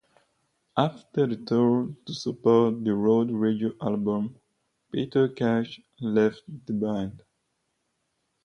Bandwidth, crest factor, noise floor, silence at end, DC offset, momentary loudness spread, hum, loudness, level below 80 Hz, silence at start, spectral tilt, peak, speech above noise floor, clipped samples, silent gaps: 6.8 kHz; 20 dB; -76 dBFS; 1.25 s; under 0.1%; 11 LU; none; -26 LUFS; -64 dBFS; 0.75 s; -7.5 dB/octave; -6 dBFS; 51 dB; under 0.1%; none